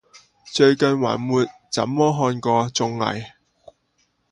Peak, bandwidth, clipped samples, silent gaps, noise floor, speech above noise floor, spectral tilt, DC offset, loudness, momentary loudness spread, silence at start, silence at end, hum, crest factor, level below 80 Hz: -4 dBFS; 11 kHz; under 0.1%; none; -67 dBFS; 48 dB; -5 dB/octave; under 0.1%; -20 LUFS; 9 LU; 0.45 s; 1.05 s; none; 18 dB; -60 dBFS